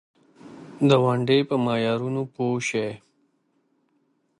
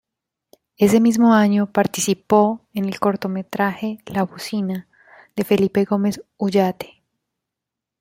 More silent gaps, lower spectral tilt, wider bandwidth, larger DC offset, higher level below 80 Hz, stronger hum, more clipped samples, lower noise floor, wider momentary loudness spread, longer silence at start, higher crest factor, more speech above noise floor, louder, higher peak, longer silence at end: neither; about the same, -6 dB/octave vs -5.5 dB/octave; second, 11 kHz vs 16 kHz; neither; second, -68 dBFS vs -60 dBFS; neither; neither; second, -69 dBFS vs -84 dBFS; first, 18 LU vs 12 LU; second, 0.45 s vs 0.8 s; about the same, 22 dB vs 18 dB; second, 47 dB vs 66 dB; second, -23 LUFS vs -19 LUFS; about the same, -4 dBFS vs -2 dBFS; first, 1.4 s vs 1.15 s